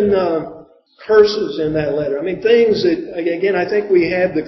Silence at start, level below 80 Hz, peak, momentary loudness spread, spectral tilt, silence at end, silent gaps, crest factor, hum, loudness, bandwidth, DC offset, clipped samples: 0 s; -48 dBFS; 0 dBFS; 8 LU; -6.5 dB/octave; 0 s; none; 16 dB; none; -16 LUFS; 6 kHz; under 0.1%; under 0.1%